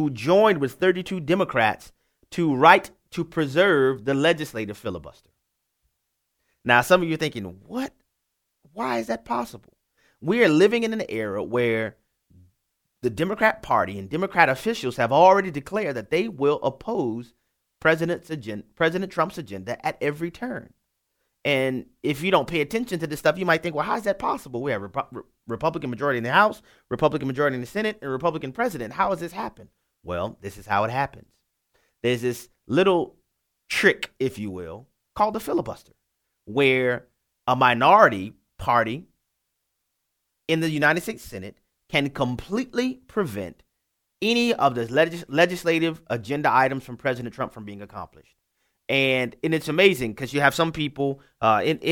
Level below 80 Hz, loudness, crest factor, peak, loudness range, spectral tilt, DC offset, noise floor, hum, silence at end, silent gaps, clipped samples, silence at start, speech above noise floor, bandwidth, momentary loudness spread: -56 dBFS; -23 LUFS; 24 dB; 0 dBFS; 6 LU; -5.5 dB/octave; under 0.1%; -78 dBFS; none; 0 s; none; under 0.1%; 0 s; 55 dB; 19.5 kHz; 15 LU